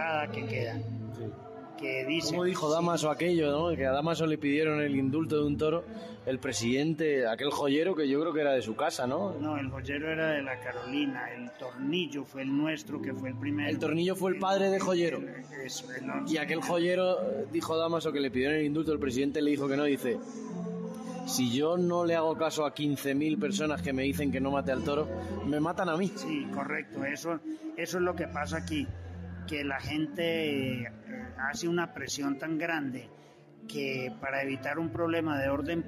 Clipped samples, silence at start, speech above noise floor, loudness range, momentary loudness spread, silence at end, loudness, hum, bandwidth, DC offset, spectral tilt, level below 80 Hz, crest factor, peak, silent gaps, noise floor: under 0.1%; 0 s; 22 dB; 5 LU; 10 LU; 0 s; -31 LUFS; none; 14.5 kHz; under 0.1%; -5 dB/octave; -64 dBFS; 14 dB; -18 dBFS; none; -53 dBFS